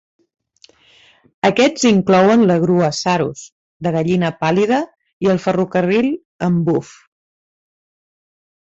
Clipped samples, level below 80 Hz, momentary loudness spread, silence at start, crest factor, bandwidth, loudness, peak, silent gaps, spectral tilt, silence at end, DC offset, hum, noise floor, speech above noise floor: under 0.1%; -56 dBFS; 10 LU; 1.45 s; 16 dB; 8 kHz; -16 LUFS; -2 dBFS; 3.52-3.80 s, 5.13-5.20 s, 6.25-6.39 s; -6 dB/octave; 1.9 s; under 0.1%; none; -51 dBFS; 36 dB